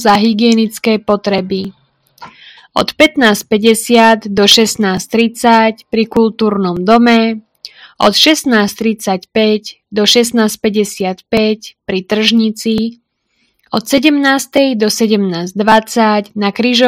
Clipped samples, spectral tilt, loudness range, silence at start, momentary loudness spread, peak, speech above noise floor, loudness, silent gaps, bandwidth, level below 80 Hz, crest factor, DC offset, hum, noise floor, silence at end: 0.7%; -4 dB/octave; 4 LU; 0 s; 9 LU; 0 dBFS; 50 dB; -11 LUFS; none; 16.5 kHz; -48 dBFS; 12 dB; under 0.1%; none; -61 dBFS; 0 s